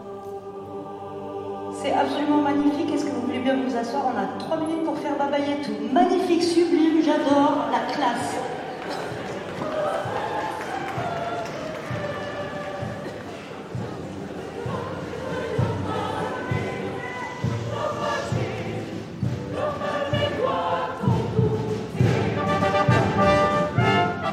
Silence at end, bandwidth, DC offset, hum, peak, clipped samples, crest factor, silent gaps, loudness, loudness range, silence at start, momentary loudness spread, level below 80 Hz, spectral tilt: 0 s; 13.5 kHz; under 0.1%; none; -6 dBFS; under 0.1%; 18 dB; none; -25 LUFS; 9 LU; 0 s; 13 LU; -50 dBFS; -6.5 dB/octave